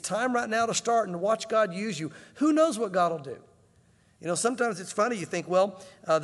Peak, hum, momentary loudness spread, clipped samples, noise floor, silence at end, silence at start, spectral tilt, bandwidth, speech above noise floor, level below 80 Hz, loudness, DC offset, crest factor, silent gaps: -12 dBFS; none; 12 LU; under 0.1%; -62 dBFS; 0 s; 0.05 s; -4 dB/octave; 12.5 kHz; 35 dB; -74 dBFS; -27 LUFS; under 0.1%; 16 dB; none